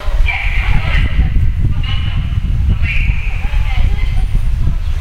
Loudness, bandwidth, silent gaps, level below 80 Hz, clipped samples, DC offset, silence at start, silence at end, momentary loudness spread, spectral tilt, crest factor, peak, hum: -17 LUFS; 6.6 kHz; none; -14 dBFS; under 0.1%; under 0.1%; 0 s; 0 s; 3 LU; -6.5 dB/octave; 12 dB; 0 dBFS; none